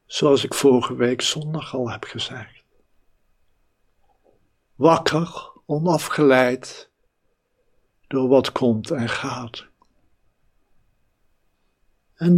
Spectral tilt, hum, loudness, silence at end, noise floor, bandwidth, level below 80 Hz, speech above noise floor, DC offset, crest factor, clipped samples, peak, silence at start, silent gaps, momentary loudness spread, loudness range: -5 dB/octave; none; -21 LUFS; 0 s; -69 dBFS; 15.5 kHz; -62 dBFS; 49 dB; under 0.1%; 22 dB; under 0.1%; -2 dBFS; 0.1 s; none; 14 LU; 11 LU